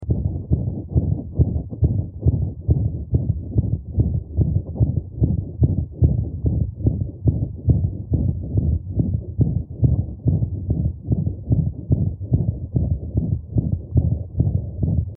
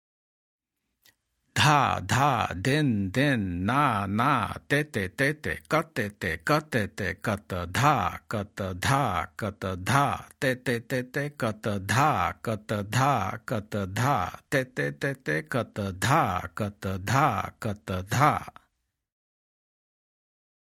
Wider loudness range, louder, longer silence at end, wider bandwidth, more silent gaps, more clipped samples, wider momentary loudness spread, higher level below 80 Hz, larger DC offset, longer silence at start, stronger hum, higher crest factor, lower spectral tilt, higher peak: about the same, 1 LU vs 3 LU; first, -22 LUFS vs -27 LUFS; second, 0 s vs 2.25 s; second, 1.1 kHz vs 16.5 kHz; neither; neither; second, 3 LU vs 9 LU; first, -28 dBFS vs -58 dBFS; neither; second, 0 s vs 1.55 s; neither; about the same, 18 dB vs 22 dB; first, -14.5 dB/octave vs -5 dB/octave; first, -2 dBFS vs -6 dBFS